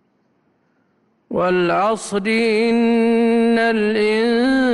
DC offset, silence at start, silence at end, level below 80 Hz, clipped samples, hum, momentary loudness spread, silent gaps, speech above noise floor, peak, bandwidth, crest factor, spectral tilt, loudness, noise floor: under 0.1%; 1.3 s; 0 s; -54 dBFS; under 0.1%; none; 4 LU; none; 46 dB; -8 dBFS; 11.5 kHz; 10 dB; -5.5 dB/octave; -17 LUFS; -62 dBFS